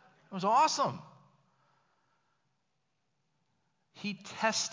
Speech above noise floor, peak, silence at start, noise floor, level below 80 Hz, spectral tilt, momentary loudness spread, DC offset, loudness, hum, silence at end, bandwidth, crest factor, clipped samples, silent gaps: 51 dB; -14 dBFS; 0.3 s; -81 dBFS; -84 dBFS; -2.5 dB/octave; 16 LU; under 0.1%; -31 LUFS; none; 0 s; 7.6 kHz; 22 dB; under 0.1%; none